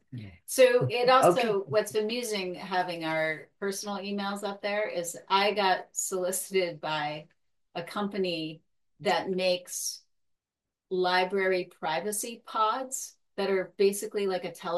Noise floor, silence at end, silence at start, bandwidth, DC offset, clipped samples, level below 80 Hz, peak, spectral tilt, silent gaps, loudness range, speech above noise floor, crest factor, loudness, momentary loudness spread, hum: -90 dBFS; 0 s; 0.1 s; 12.5 kHz; under 0.1%; under 0.1%; -78 dBFS; -10 dBFS; -3.5 dB/octave; none; 6 LU; 61 dB; 20 dB; -28 LUFS; 12 LU; none